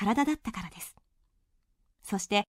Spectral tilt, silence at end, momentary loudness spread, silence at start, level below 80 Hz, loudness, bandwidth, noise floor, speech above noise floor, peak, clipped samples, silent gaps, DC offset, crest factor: -4 dB/octave; 0.1 s; 17 LU; 0 s; -58 dBFS; -31 LUFS; 16 kHz; -72 dBFS; 41 dB; -12 dBFS; under 0.1%; none; under 0.1%; 20 dB